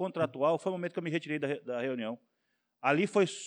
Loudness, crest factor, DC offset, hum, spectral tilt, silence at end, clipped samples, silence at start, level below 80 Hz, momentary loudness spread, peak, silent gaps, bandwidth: -32 LUFS; 20 dB; under 0.1%; none; -5.5 dB/octave; 0 s; under 0.1%; 0 s; -90 dBFS; 8 LU; -12 dBFS; none; 10.5 kHz